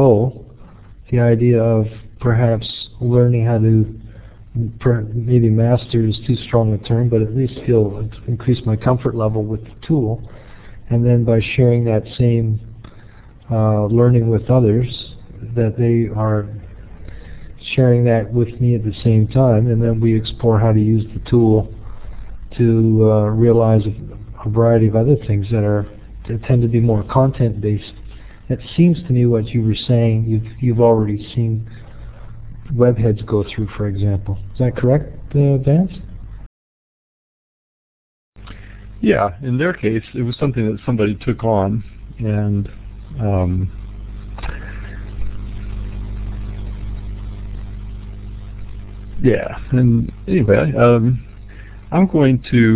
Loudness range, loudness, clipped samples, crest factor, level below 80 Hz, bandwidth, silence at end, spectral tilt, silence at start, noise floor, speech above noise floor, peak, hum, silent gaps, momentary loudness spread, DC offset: 9 LU; -17 LUFS; under 0.1%; 16 dB; -34 dBFS; 4 kHz; 0 s; -12.5 dB/octave; 0 s; -40 dBFS; 25 dB; 0 dBFS; none; 36.46-38.32 s; 19 LU; under 0.1%